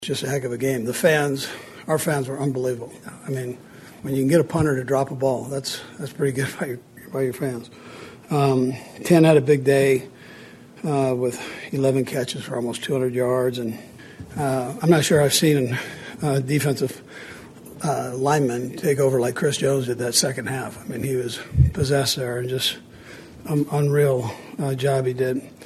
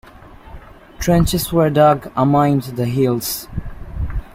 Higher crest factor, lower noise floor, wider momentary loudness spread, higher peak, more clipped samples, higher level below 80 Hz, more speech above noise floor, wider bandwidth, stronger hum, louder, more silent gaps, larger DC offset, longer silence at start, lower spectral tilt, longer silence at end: about the same, 20 dB vs 16 dB; about the same, -43 dBFS vs -40 dBFS; first, 18 LU vs 15 LU; about the same, -2 dBFS vs -2 dBFS; neither; second, -44 dBFS vs -32 dBFS; about the same, 22 dB vs 24 dB; second, 13 kHz vs 16 kHz; neither; second, -22 LUFS vs -17 LUFS; neither; neither; second, 0 s vs 0.25 s; about the same, -5 dB/octave vs -6 dB/octave; about the same, 0 s vs 0.05 s